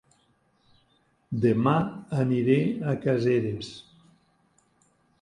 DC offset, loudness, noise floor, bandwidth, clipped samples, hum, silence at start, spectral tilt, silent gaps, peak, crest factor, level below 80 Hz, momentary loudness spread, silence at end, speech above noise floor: under 0.1%; -26 LUFS; -67 dBFS; 11 kHz; under 0.1%; none; 1.3 s; -8.5 dB/octave; none; -8 dBFS; 20 dB; -62 dBFS; 13 LU; 1.4 s; 42 dB